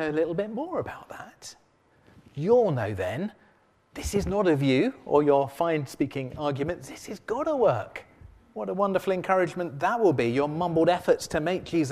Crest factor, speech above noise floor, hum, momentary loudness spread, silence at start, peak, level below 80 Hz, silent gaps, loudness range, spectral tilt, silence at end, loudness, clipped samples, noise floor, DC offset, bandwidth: 18 dB; 37 dB; none; 17 LU; 0 s; -8 dBFS; -52 dBFS; none; 4 LU; -6.5 dB/octave; 0 s; -26 LUFS; under 0.1%; -63 dBFS; under 0.1%; 15 kHz